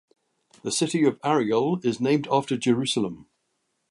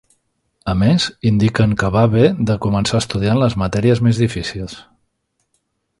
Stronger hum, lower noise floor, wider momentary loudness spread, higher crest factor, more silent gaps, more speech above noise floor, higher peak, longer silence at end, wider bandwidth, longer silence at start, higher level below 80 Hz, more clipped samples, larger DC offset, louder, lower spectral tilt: neither; first, -75 dBFS vs -69 dBFS; second, 7 LU vs 11 LU; about the same, 18 dB vs 16 dB; neither; about the same, 52 dB vs 54 dB; second, -8 dBFS vs 0 dBFS; second, 0.7 s vs 1.2 s; about the same, 11.5 kHz vs 11.5 kHz; about the same, 0.65 s vs 0.65 s; second, -68 dBFS vs -38 dBFS; neither; neither; second, -24 LUFS vs -16 LUFS; second, -5 dB/octave vs -6.5 dB/octave